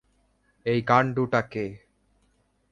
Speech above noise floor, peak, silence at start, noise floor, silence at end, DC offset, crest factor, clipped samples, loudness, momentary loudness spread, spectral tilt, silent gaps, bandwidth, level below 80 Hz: 44 dB; -6 dBFS; 0.65 s; -68 dBFS; 0.95 s; under 0.1%; 22 dB; under 0.1%; -25 LUFS; 12 LU; -7.5 dB/octave; none; 7.4 kHz; -60 dBFS